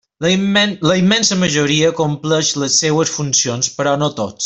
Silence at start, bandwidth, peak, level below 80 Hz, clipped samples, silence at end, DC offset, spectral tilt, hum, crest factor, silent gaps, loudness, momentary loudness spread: 0.2 s; 8.4 kHz; -2 dBFS; -52 dBFS; under 0.1%; 0 s; under 0.1%; -3.5 dB/octave; none; 14 dB; none; -15 LUFS; 5 LU